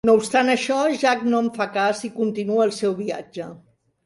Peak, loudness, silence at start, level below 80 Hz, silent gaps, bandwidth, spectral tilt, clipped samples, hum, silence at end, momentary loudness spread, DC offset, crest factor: -4 dBFS; -21 LUFS; 0.05 s; -62 dBFS; none; 11.5 kHz; -4.5 dB/octave; under 0.1%; none; 0.5 s; 12 LU; under 0.1%; 16 dB